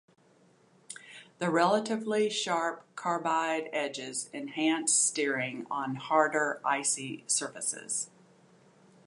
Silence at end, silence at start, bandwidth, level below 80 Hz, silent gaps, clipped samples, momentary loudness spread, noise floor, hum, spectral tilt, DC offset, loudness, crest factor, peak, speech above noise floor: 1 s; 0.9 s; 11.5 kHz; -86 dBFS; none; under 0.1%; 11 LU; -63 dBFS; none; -2.5 dB/octave; under 0.1%; -30 LUFS; 22 dB; -10 dBFS; 33 dB